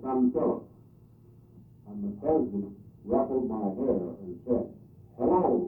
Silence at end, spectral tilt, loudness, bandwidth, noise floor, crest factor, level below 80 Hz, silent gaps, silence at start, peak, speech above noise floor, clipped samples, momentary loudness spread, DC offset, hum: 0 s; -13 dB/octave; -29 LUFS; 2.7 kHz; -55 dBFS; 16 dB; -58 dBFS; none; 0 s; -12 dBFS; 27 dB; under 0.1%; 15 LU; under 0.1%; none